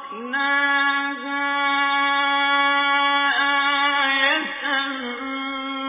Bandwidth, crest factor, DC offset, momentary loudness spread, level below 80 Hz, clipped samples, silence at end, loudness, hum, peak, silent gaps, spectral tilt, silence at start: 3.9 kHz; 14 dB; under 0.1%; 9 LU; -68 dBFS; under 0.1%; 0 s; -19 LUFS; none; -8 dBFS; none; 3.5 dB/octave; 0 s